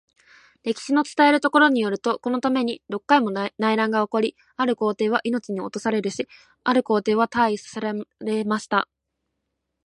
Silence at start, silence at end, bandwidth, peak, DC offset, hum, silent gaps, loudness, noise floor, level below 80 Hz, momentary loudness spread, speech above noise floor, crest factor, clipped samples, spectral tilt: 0.65 s; 1 s; 11 kHz; -4 dBFS; under 0.1%; none; none; -22 LUFS; -79 dBFS; -70 dBFS; 11 LU; 57 dB; 18 dB; under 0.1%; -5 dB/octave